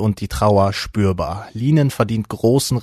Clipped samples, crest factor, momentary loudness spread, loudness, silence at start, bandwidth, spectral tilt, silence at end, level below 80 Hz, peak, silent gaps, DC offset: under 0.1%; 16 dB; 7 LU; -18 LUFS; 0 s; 13.5 kHz; -6.5 dB/octave; 0 s; -38 dBFS; -2 dBFS; none; under 0.1%